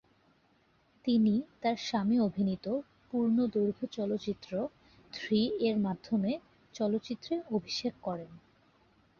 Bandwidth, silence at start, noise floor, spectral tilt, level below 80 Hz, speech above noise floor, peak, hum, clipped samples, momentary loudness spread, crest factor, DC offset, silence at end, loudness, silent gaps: 7 kHz; 1.05 s; -69 dBFS; -6.5 dB/octave; -68 dBFS; 37 dB; -18 dBFS; none; under 0.1%; 11 LU; 16 dB; under 0.1%; 0.8 s; -33 LUFS; none